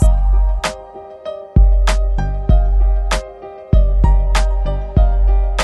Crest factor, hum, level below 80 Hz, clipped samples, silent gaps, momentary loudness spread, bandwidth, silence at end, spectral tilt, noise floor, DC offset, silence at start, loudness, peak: 12 dB; none; -14 dBFS; under 0.1%; none; 15 LU; 11.5 kHz; 0 s; -6 dB/octave; -34 dBFS; under 0.1%; 0 s; -17 LUFS; 0 dBFS